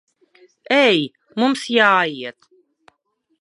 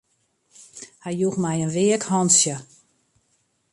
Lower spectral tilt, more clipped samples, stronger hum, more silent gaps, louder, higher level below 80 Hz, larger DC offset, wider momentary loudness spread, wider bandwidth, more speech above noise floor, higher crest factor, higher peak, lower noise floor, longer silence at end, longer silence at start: about the same, -4 dB/octave vs -4 dB/octave; neither; neither; neither; first, -17 LUFS vs -20 LUFS; second, -76 dBFS vs -66 dBFS; neither; second, 14 LU vs 20 LU; about the same, 11.5 kHz vs 11.5 kHz; first, 52 dB vs 47 dB; about the same, 20 dB vs 20 dB; first, 0 dBFS vs -4 dBFS; about the same, -69 dBFS vs -68 dBFS; about the same, 1.1 s vs 1.1 s; about the same, 0.7 s vs 0.75 s